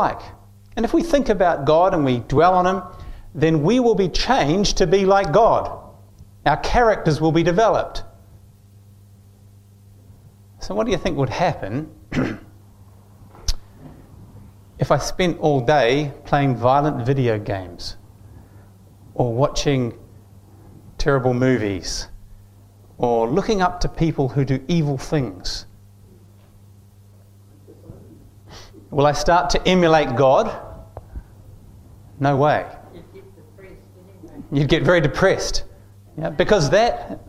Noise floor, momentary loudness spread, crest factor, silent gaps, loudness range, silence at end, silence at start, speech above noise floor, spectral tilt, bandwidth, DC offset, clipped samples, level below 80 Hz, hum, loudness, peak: -48 dBFS; 16 LU; 18 dB; none; 9 LU; 0.05 s; 0 s; 30 dB; -5.5 dB/octave; 14.5 kHz; under 0.1%; under 0.1%; -36 dBFS; none; -19 LUFS; -2 dBFS